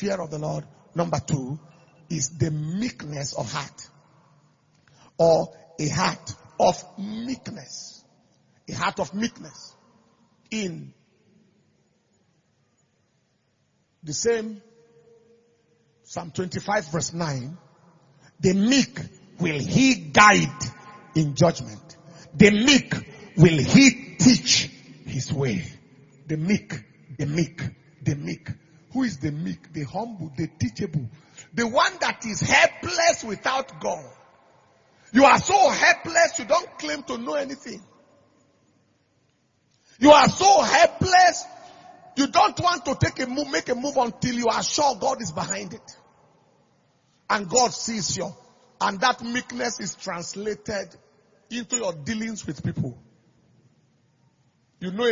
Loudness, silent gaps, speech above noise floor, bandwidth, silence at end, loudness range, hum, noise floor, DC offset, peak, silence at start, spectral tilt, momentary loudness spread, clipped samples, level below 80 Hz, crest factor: -22 LUFS; none; 46 dB; 7.6 kHz; 0 s; 14 LU; none; -69 dBFS; under 0.1%; 0 dBFS; 0 s; -4 dB/octave; 19 LU; under 0.1%; -56 dBFS; 24 dB